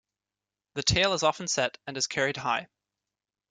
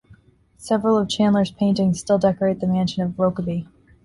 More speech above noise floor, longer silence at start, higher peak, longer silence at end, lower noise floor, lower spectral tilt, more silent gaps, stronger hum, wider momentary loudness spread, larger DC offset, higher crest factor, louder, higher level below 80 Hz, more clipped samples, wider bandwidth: first, over 62 dB vs 33 dB; first, 0.75 s vs 0.6 s; about the same, -8 dBFS vs -6 dBFS; first, 0.85 s vs 0.4 s; first, under -90 dBFS vs -53 dBFS; second, -2.5 dB/octave vs -6.5 dB/octave; neither; first, 50 Hz at -65 dBFS vs none; about the same, 8 LU vs 8 LU; neither; first, 22 dB vs 16 dB; second, -27 LUFS vs -21 LUFS; about the same, -52 dBFS vs -52 dBFS; neither; about the same, 11 kHz vs 11.5 kHz